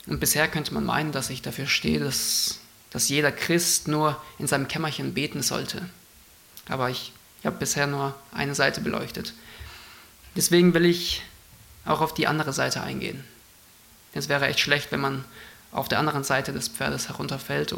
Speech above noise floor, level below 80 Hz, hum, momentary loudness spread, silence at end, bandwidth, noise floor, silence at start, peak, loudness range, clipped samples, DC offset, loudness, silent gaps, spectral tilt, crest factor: 28 dB; -52 dBFS; none; 16 LU; 0 s; 17 kHz; -53 dBFS; 0.05 s; -4 dBFS; 5 LU; under 0.1%; under 0.1%; -25 LUFS; none; -3.5 dB/octave; 22 dB